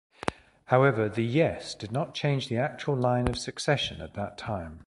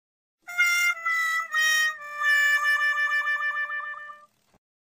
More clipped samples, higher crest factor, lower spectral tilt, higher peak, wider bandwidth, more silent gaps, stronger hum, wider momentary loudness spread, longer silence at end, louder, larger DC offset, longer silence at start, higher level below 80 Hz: neither; first, 24 dB vs 14 dB; first, -6 dB/octave vs 4 dB/octave; first, -4 dBFS vs -12 dBFS; second, 11.5 kHz vs 15.5 kHz; neither; neither; about the same, 12 LU vs 12 LU; second, 0.05 s vs 0.65 s; second, -28 LUFS vs -23 LUFS; neither; second, 0.25 s vs 0.5 s; first, -50 dBFS vs -82 dBFS